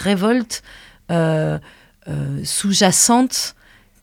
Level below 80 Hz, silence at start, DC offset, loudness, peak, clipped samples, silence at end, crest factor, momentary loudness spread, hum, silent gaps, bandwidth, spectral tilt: -50 dBFS; 0 s; under 0.1%; -17 LUFS; -2 dBFS; under 0.1%; 0.5 s; 18 dB; 15 LU; none; none; 19.5 kHz; -3.5 dB/octave